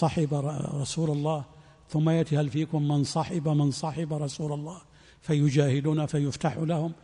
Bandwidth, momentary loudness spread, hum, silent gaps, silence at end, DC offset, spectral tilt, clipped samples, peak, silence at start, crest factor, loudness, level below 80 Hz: 10.5 kHz; 9 LU; none; none; 0.1 s; under 0.1%; -7 dB/octave; under 0.1%; -10 dBFS; 0 s; 16 dB; -28 LUFS; -58 dBFS